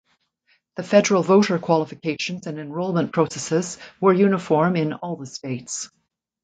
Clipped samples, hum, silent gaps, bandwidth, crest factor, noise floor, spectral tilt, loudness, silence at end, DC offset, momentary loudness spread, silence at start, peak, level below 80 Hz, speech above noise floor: under 0.1%; none; none; 9.4 kHz; 20 dB; -66 dBFS; -5.5 dB/octave; -21 LUFS; 0.55 s; under 0.1%; 14 LU; 0.75 s; -2 dBFS; -66 dBFS; 45 dB